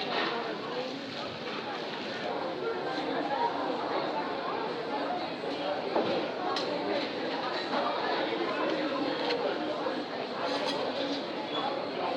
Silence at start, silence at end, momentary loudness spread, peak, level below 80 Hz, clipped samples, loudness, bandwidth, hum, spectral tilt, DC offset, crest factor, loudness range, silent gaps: 0 s; 0 s; 5 LU; -16 dBFS; -78 dBFS; under 0.1%; -32 LUFS; 11.5 kHz; none; -4.5 dB/octave; under 0.1%; 16 dB; 2 LU; none